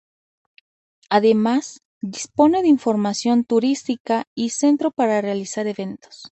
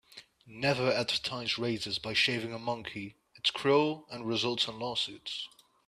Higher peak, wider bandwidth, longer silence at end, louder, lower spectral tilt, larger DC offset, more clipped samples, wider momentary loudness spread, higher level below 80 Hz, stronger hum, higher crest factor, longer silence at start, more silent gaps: first, -4 dBFS vs -14 dBFS; second, 8.8 kHz vs 14 kHz; second, 0.05 s vs 0.4 s; first, -20 LUFS vs -31 LUFS; about the same, -5 dB/octave vs -4 dB/octave; neither; neither; about the same, 14 LU vs 12 LU; about the same, -64 dBFS vs -68 dBFS; neither; about the same, 18 dB vs 20 dB; first, 1.1 s vs 0.1 s; first, 1.85-2.01 s, 4.00-4.05 s, 4.27-4.36 s vs none